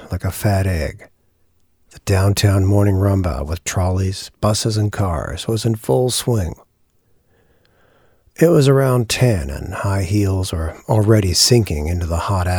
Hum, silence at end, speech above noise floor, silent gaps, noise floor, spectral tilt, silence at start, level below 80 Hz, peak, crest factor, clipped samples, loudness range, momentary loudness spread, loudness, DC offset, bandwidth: none; 0 s; 42 dB; none; -59 dBFS; -5.5 dB/octave; 0 s; -34 dBFS; 0 dBFS; 18 dB; under 0.1%; 4 LU; 11 LU; -17 LUFS; under 0.1%; 20 kHz